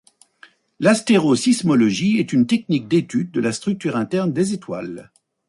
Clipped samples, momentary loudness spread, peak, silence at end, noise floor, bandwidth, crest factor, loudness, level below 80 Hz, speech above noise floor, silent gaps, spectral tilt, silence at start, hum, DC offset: under 0.1%; 10 LU; -4 dBFS; 0.45 s; -51 dBFS; 11.5 kHz; 16 dB; -19 LUFS; -60 dBFS; 33 dB; none; -5.5 dB/octave; 0.8 s; none; under 0.1%